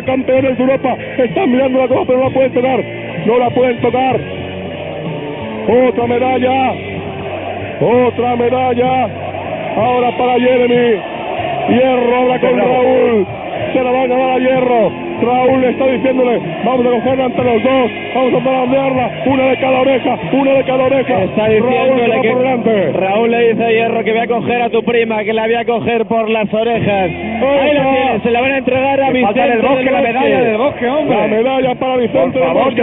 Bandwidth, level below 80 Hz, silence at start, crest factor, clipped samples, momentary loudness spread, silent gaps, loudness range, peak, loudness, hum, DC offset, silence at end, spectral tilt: 3.9 kHz; -46 dBFS; 0 s; 12 dB; under 0.1%; 7 LU; none; 3 LU; 0 dBFS; -13 LUFS; none; under 0.1%; 0 s; -4.5 dB/octave